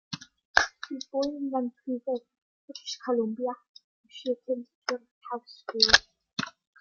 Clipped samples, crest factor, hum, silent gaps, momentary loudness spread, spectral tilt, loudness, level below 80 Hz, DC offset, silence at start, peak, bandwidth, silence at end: under 0.1%; 30 dB; none; 0.45-0.54 s, 2.42-2.68 s, 3.69-3.74 s, 3.84-4.04 s, 4.75-4.82 s, 5.11-5.21 s; 18 LU; -2 dB/octave; -29 LUFS; -58 dBFS; under 0.1%; 0.1 s; 0 dBFS; 7.6 kHz; 0.3 s